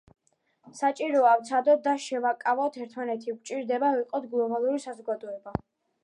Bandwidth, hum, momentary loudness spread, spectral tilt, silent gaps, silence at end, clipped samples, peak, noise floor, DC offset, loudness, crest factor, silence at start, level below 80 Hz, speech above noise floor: 11 kHz; none; 13 LU; -5 dB/octave; none; 0.45 s; under 0.1%; -10 dBFS; -66 dBFS; under 0.1%; -27 LUFS; 18 dB; 0.65 s; -62 dBFS; 39 dB